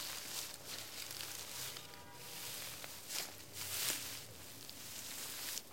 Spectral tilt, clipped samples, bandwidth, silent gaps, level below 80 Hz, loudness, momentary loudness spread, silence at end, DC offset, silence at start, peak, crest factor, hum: -0.5 dB/octave; under 0.1%; 17 kHz; none; -76 dBFS; -44 LUFS; 11 LU; 0 s; 0.1%; 0 s; -18 dBFS; 28 dB; none